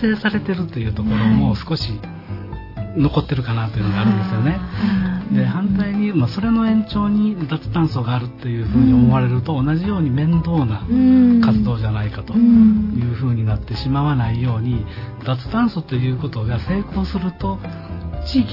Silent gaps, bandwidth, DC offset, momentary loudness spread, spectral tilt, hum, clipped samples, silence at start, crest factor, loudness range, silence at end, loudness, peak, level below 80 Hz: none; 5.8 kHz; under 0.1%; 12 LU; -9.5 dB/octave; none; under 0.1%; 0 s; 14 dB; 6 LU; 0 s; -18 LUFS; -4 dBFS; -34 dBFS